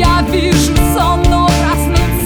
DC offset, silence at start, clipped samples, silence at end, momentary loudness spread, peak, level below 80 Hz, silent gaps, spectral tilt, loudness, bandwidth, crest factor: under 0.1%; 0 s; under 0.1%; 0 s; 2 LU; 0 dBFS; -16 dBFS; none; -5 dB/octave; -12 LUFS; over 20 kHz; 10 dB